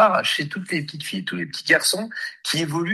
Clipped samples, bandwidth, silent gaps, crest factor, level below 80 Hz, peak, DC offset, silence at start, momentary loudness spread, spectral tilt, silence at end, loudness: under 0.1%; 12.5 kHz; none; 20 dB; -68 dBFS; -2 dBFS; under 0.1%; 0 s; 11 LU; -3 dB/octave; 0 s; -22 LUFS